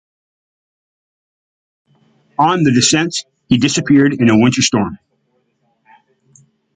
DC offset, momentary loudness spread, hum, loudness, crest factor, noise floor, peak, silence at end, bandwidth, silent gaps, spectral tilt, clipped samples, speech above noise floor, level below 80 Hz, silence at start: under 0.1%; 10 LU; none; -13 LUFS; 16 dB; -63 dBFS; 0 dBFS; 1.8 s; 9.6 kHz; none; -4 dB/octave; under 0.1%; 51 dB; -50 dBFS; 2.4 s